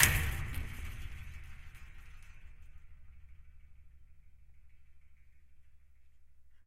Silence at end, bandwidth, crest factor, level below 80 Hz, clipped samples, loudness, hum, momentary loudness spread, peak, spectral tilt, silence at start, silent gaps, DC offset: 0.05 s; 16 kHz; 38 dB; -46 dBFS; under 0.1%; -37 LUFS; none; 24 LU; -2 dBFS; -2 dB/octave; 0 s; none; under 0.1%